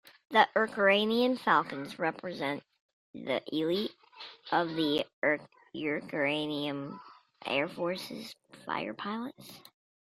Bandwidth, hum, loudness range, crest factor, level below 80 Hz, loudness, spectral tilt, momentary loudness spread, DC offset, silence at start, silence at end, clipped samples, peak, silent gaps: 15.5 kHz; none; 6 LU; 24 dB; -76 dBFS; -31 LUFS; -5 dB/octave; 20 LU; under 0.1%; 0.05 s; 0.5 s; under 0.1%; -8 dBFS; 2.80-3.14 s, 5.13-5.22 s